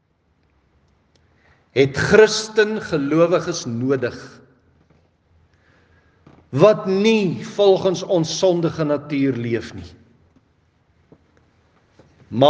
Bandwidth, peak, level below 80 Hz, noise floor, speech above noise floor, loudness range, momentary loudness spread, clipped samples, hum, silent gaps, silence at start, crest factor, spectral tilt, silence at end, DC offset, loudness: 9.6 kHz; 0 dBFS; -58 dBFS; -63 dBFS; 45 dB; 9 LU; 11 LU; under 0.1%; none; none; 1.75 s; 20 dB; -5.5 dB/octave; 0 s; under 0.1%; -18 LUFS